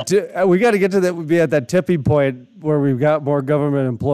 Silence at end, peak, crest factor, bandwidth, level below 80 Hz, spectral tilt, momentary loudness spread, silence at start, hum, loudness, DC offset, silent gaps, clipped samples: 0 s; -4 dBFS; 12 dB; 14 kHz; -52 dBFS; -7 dB/octave; 5 LU; 0 s; none; -17 LUFS; under 0.1%; none; under 0.1%